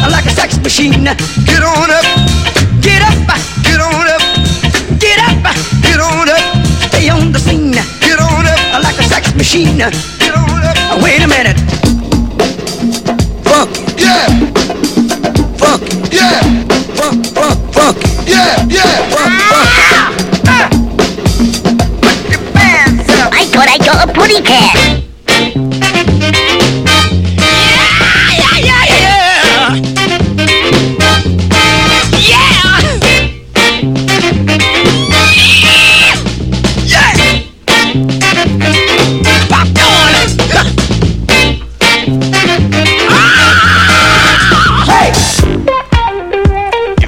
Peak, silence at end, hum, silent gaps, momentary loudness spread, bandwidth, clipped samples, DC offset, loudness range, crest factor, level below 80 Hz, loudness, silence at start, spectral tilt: 0 dBFS; 0 s; none; none; 7 LU; 17 kHz; 1%; under 0.1%; 4 LU; 8 dB; -20 dBFS; -7 LUFS; 0 s; -4 dB/octave